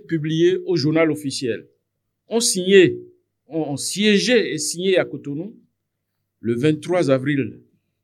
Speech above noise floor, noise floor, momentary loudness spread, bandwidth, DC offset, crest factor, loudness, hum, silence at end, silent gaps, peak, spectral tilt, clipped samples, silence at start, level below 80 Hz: 57 dB; -76 dBFS; 16 LU; 14.5 kHz; under 0.1%; 18 dB; -19 LUFS; none; 0.45 s; none; -2 dBFS; -4.5 dB/octave; under 0.1%; 0.1 s; -72 dBFS